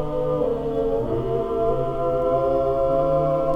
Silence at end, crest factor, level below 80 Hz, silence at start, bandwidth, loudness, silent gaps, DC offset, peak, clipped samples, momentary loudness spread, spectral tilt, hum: 0 s; 12 dB; -36 dBFS; 0 s; 6 kHz; -22 LUFS; none; under 0.1%; -8 dBFS; under 0.1%; 4 LU; -9.5 dB/octave; none